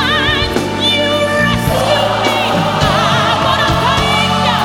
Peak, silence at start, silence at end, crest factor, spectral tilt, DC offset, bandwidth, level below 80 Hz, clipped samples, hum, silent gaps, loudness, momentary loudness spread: 0 dBFS; 0 s; 0 s; 12 dB; -4.5 dB/octave; under 0.1%; 19 kHz; -30 dBFS; under 0.1%; none; none; -12 LUFS; 2 LU